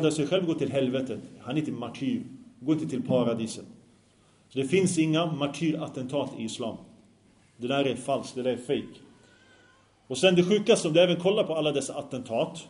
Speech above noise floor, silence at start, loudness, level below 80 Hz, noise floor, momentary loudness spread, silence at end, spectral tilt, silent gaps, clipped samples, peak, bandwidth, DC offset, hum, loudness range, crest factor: 34 dB; 0 s; -27 LUFS; -68 dBFS; -61 dBFS; 14 LU; 0 s; -5 dB/octave; none; under 0.1%; -6 dBFS; 11 kHz; under 0.1%; none; 7 LU; 22 dB